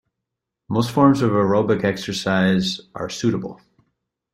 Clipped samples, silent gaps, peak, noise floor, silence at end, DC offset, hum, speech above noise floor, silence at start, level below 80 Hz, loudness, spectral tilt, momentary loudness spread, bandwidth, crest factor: under 0.1%; none; -2 dBFS; -82 dBFS; 0.8 s; under 0.1%; none; 63 dB; 0.7 s; -54 dBFS; -20 LUFS; -6 dB/octave; 12 LU; 15 kHz; 18 dB